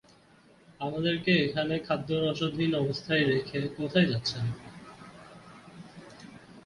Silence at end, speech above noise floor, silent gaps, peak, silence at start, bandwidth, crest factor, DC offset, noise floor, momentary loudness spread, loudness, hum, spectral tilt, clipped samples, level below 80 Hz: 0.05 s; 31 dB; none; -12 dBFS; 0.8 s; 11.5 kHz; 20 dB; under 0.1%; -59 dBFS; 23 LU; -29 LUFS; none; -6.5 dB/octave; under 0.1%; -60 dBFS